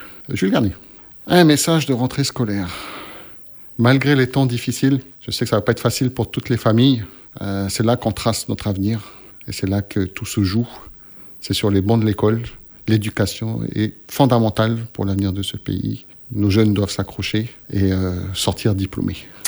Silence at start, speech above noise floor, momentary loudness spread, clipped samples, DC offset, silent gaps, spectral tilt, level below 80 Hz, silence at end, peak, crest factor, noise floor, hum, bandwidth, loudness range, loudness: 0 s; 22 dB; 16 LU; under 0.1%; under 0.1%; none; -5.5 dB/octave; -46 dBFS; 0 s; 0 dBFS; 18 dB; -40 dBFS; none; over 20 kHz; 4 LU; -19 LUFS